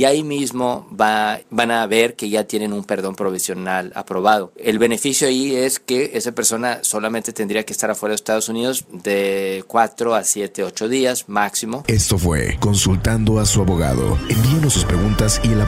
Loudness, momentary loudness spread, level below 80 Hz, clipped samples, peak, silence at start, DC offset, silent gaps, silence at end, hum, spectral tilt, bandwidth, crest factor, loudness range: -18 LUFS; 6 LU; -32 dBFS; under 0.1%; 0 dBFS; 0 s; under 0.1%; none; 0 s; none; -4 dB/octave; 16 kHz; 18 dB; 3 LU